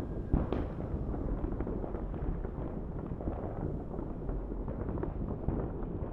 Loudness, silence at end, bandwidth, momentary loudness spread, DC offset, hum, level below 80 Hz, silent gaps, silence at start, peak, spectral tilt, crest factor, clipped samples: -38 LUFS; 0 s; 4 kHz; 5 LU; under 0.1%; none; -40 dBFS; none; 0 s; -14 dBFS; -11 dB/octave; 20 dB; under 0.1%